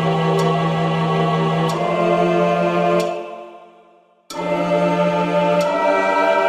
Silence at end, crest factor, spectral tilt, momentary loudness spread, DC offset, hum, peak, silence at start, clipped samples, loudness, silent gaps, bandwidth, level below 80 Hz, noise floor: 0 s; 14 dB; -6.5 dB/octave; 8 LU; under 0.1%; none; -4 dBFS; 0 s; under 0.1%; -18 LUFS; none; 13 kHz; -56 dBFS; -52 dBFS